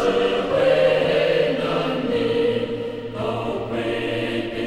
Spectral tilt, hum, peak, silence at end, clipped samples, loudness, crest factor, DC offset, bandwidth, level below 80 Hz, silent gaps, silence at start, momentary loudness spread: -6 dB/octave; none; -6 dBFS; 0 s; under 0.1%; -21 LUFS; 14 dB; under 0.1%; 12 kHz; -48 dBFS; none; 0 s; 9 LU